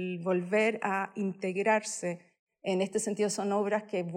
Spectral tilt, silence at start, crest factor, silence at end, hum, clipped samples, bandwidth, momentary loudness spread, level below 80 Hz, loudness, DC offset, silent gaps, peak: -4.5 dB/octave; 0 s; 16 dB; 0 s; none; under 0.1%; 16 kHz; 8 LU; -86 dBFS; -31 LUFS; under 0.1%; 2.39-2.47 s; -16 dBFS